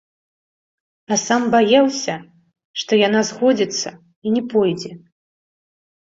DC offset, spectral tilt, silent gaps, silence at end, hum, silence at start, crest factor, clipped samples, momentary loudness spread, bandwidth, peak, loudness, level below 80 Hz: under 0.1%; -3.5 dB/octave; 2.65-2.74 s, 4.16-4.22 s; 1.15 s; none; 1.1 s; 18 dB; under 0.1%; 15 LU; 7.8 kHz; -2 dBFS; -18 LUFS; -64 dBFS